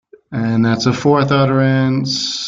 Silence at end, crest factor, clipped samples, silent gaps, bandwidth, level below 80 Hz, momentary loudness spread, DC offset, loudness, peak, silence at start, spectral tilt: 0 s; 14 dB; under 0.1%; none; 7.6 kHz; -50 dBFS; 5 LU; under 0.1%; -15 LUFS; -2 dBFS; 0.3 s; -5.5 dB/octave